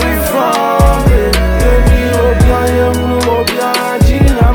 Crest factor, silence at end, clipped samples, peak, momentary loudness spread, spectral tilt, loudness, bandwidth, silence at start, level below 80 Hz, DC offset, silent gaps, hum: 10 dB; 0 s; under 0.1%; 0 dBFS; 3 LU; -6 dB/octave; -11 LUFS; 19.5 kHz; 0 s; -14 dBFS; under 0.1%; none; none